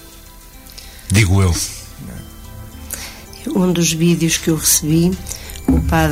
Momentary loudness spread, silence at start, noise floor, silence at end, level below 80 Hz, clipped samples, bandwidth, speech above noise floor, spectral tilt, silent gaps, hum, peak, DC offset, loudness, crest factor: 22 LU; 0 s; -39 dBFS; 0 s; -30 dBFS; under 0.1%; 16 kHz; 24 dB; -4.5 dB/octave; none; 50 Hz at -40 dBFS; -2 dBFS; under 0.1%; -16 LUFS; 16 dB